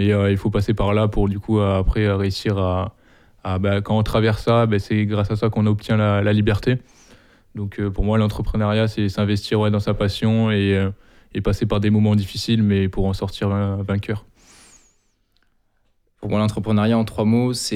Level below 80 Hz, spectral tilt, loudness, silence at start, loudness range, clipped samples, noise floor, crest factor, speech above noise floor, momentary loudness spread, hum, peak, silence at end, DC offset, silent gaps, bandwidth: -34 dBFS; -7 dB/octave; -20 LUFS; 0 s; 5 LU; under 0.1%; -63 dBFS; 12 dB; 45 dB; 8 LU; none; -6 dBFS; 0 s; under 0.1%; none; 12.5 kHz